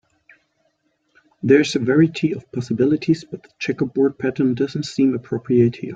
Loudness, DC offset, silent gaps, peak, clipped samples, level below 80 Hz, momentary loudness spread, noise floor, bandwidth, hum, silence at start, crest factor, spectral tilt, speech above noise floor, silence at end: -19 LUFS; under 0.1%; none; -2 dBFS; under 0.1%; -60 dBFS; 10 LU; -67 dBFS; 9 kHz; none; 1.45 s; 18 dB; -7 dB/octave; 48 dB; 0 s